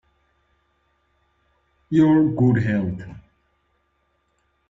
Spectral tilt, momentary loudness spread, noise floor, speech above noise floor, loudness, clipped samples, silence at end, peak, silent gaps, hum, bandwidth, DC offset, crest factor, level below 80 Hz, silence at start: -9.5 dB/octave; 16 LU; -69 dBFS; 50 dB; -19 LUFS; under 0.1%; 1.5 s; -6 dBFS; none; none; 7.4 kHz; under 0.1%; 18 dB; -54 dBFS; 1.9 s